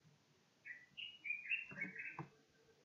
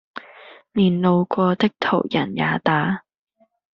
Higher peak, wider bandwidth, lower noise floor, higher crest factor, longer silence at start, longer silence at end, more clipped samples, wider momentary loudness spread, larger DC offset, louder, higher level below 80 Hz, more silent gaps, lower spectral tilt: second, -30 dBFS vs -4 dBFS; first, 7.2 kHz vs 6.2 kHz; first, -75 dBFS vs -45 dBFS; about the same, 20 dB vs 18 dB; about the same, 0.05 s vs 0.15 s; second, 0 s vs 0.75 s; neither; first, 15 LU vs 10 LU; neither; second, -46 LUFS vs -20 LUFS; second, under -90 dBFS vs -58 dBFS; neither; second, -1 dB/octave vs -5 dB/octave